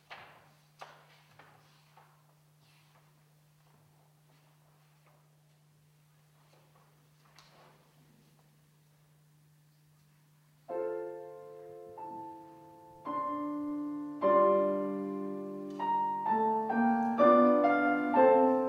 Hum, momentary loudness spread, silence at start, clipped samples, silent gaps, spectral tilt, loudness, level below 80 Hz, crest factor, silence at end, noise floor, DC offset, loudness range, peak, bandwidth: none; 25 LU; 0.1 s; under 0.1%; none; -7.5 dB/octave; -29 LUFS; -82 dBFS; 20 dB; 0 s; -65 dBFS; under 0.1%; 17 LU; -12 dBFS; 12 kHz